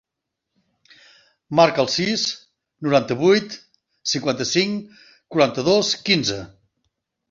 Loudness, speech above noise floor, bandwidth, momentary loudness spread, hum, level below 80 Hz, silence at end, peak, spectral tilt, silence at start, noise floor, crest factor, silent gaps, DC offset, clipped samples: -20 LUFS; 62 dB; 7.6 kHz; 13 LU; none; -60 dBFS; 0.85 s; -2 dBFS; -4 dB/octave; 1.5 s; -82 dBFS; 20 dB; none; under 0.1%; under 0.1%